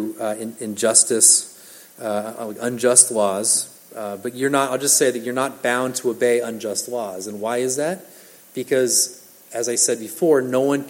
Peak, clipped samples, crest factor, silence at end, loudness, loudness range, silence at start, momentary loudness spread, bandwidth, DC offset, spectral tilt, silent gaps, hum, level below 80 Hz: 0 dBFS; under 0.1%; 20 dB; 0 s; -18 LUFS; 6 LU; 0 s; 17 LU; 17 kHz; under 0.1%; -2 dB/octave; none; none; -76 dBFS